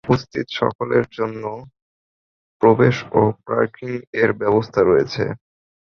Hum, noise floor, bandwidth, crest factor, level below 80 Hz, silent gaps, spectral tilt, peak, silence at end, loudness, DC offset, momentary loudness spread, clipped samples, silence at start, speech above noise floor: none; under -90 dBFS; 6.8 kHz; 18 dB; -50 dBFS; 0.75-0.79 s, 1.82-2.60 s, 4.07-4.13 s; -7.5 dB/octave; -2 dBFS; 0.55 s; -19 LUFS; under 0.1%; 11 LU; under 0.1%; 0.05 s; over 71 dB